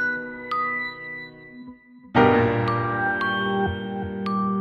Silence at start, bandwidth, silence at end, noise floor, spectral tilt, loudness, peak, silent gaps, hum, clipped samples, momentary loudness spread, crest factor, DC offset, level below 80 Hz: 0 s; 6.6 kHz; 0 s; -45 dBFS; -8 dB/octave; -23 LUFS; -4 dBFS; none; none; under 0.1%; 21 LU; 20 dB; under 0.1%; -50 dBFS